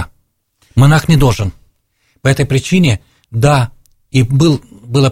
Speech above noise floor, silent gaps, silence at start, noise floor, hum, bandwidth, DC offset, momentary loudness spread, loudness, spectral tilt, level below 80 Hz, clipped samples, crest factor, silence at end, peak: 49 dB; none; 0 s; -59 dBFS; none; 16 kHz; under 0.1%; 11 LU; -13 LUFS; -6 dB/octave; -32 dBFS; under 0.1%; 12 dB; 0 s; 0 dBFS